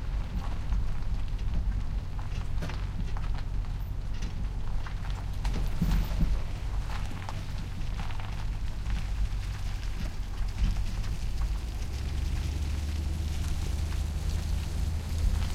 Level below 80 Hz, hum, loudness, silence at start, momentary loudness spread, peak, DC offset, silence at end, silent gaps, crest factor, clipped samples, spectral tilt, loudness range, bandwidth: -32 dBFS; none; -35 LUFS; 0 s; 5 LU; -14 dBFS; under 0.1%; 0 s; none; 16 dB; under 0.1%; -6 dB/octave; 3 LU; 15.5 kHz